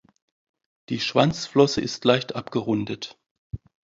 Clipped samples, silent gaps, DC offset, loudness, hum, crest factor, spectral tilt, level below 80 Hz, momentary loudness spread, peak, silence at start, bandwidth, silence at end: under 0.1%; 3.31-3.50 s; under 0.1%; -23 LUFS; none; 22 dB; -5.5 dB/octave; -54 dBFS; 20 LU; -2 dBFS; 0.9 s; 7.8 kHz; 0.4 s